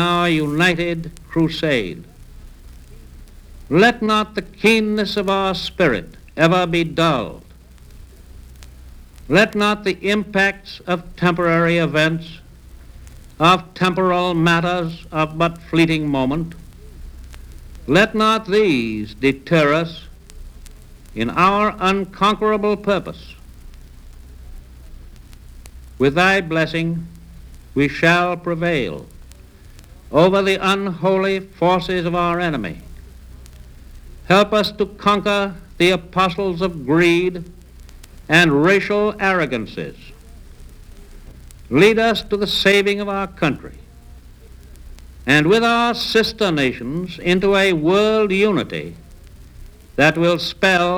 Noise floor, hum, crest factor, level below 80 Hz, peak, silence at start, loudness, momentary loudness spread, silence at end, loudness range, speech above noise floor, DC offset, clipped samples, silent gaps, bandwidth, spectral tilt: -43 dBFS; none; 18 dB; -40 dBFS; 0 dBFS; 0 s; -17 LUFS; 12 LU; 0 s; 4 LU; 25 dB; under 0.1%; under 0.1%; none; 19.5 kHz; -5.5 dB/octave